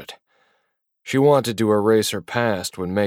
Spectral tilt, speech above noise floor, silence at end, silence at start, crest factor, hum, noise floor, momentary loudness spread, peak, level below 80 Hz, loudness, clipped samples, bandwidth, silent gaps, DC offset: -5 dB/octave; 53 dB; 0 s; 0 s; 18 dB; none; -72 dBFS; 9 LU; -4 dBFS; -60 dBFS; -20 LUFS; under 0.1%; 16.5 kHz; none; under 0.1%